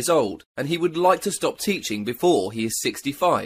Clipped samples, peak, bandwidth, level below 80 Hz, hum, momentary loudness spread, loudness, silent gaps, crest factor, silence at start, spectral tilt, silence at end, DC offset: under 0.1%; -4 dBFS; 15.5 kHz; -60 dBFS; none; 7 LU; -23 LUFS; 0.46-0.55 s; 18 dB; 0 s; -4 dB/octave; 0 s; under 0.1%